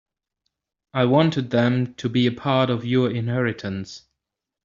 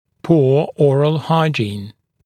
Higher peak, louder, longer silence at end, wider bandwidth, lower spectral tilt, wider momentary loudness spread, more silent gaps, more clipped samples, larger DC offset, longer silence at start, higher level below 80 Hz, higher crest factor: second, -4 dBFS vs 0 dBFS; second, -22 LUFS vs -16 LUFS; first, 0.65 s vs 0.35 s; second, 7.4 kHz vs 9.6 kHz; second, -5.5 dB/octave vs -8 dB/octave; first, 12 LU vs 9 LU; neither; neither; neither; first, 0.95 s vs 0.25 s; about the same, -60 dBFS vs -58 dBFS; about the same, 18 dB vs 16 dB